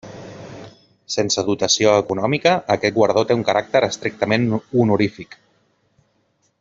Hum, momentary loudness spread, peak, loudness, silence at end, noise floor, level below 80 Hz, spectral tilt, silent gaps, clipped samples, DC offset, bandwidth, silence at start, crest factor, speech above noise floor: none; 21 LU; -2 dBFS; -18 LUFS; 1.35 s; -65 dBFS; -58 dBFS; -4.5 dB/octave; none; under 0.1%; under 0.1%; 7.8 kHz; 0.05 s; 18 dB; 47 dB